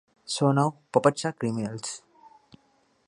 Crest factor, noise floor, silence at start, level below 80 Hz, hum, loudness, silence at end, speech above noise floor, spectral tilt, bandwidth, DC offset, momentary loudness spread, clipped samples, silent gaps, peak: 24 dB; -66 dBFS; 0.3 s; -70 dBFS; none; -26 LUFS; 1.1 s; 41 dB; -5.5 dB/octave; 11.5 kHz; under 0.1%; 13 LU; under 0.1%; none; -4 dBFS